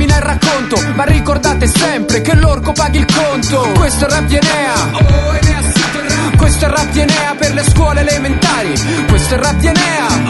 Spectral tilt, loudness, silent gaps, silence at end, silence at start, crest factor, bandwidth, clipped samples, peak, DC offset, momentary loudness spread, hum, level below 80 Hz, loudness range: -4.5 dB/octave; -11 LUFS; none; 0 s; 0 s; 10 dB; 12 kHz; under 0.1%; 0 dBFS; under 0.1%; 3 LU; none; -16 dBFS; 0 LU